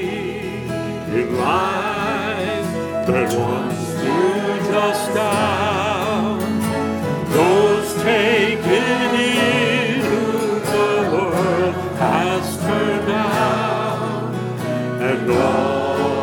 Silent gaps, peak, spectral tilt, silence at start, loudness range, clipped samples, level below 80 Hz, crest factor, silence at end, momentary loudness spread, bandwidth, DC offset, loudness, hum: none; -4 dBFS; -5 dB/octave; 0 s; 4 LU; under 0.1%; -50 dBFS; 14 dB; 0 s; 7 LU; 19 kHz; under 0.1%; -19 LUFS; none